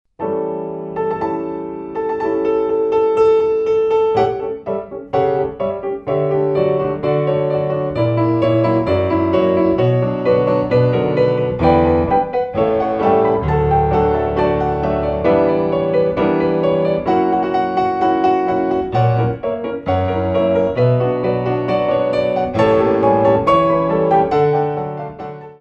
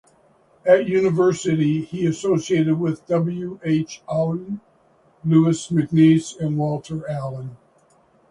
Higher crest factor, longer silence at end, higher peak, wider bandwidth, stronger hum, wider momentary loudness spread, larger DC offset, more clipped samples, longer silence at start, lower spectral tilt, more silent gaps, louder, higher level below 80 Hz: about the same, 14 dB vs 18 dB; second, 0.05 s vs 0.75 s; about the same, -2 dBFS vs -2 dBFS; second, 7.4 kHz vs 11 kHz; neither; second, 8 LU vs 12 LU; neither; neither; second, 0.2 s vs 0.65 s; first, -9 dB/octave vs -7 dB/octave; neither; first, -16 LUFS vs -20 LUFS; first, -38 dBFS vs -58 dBFS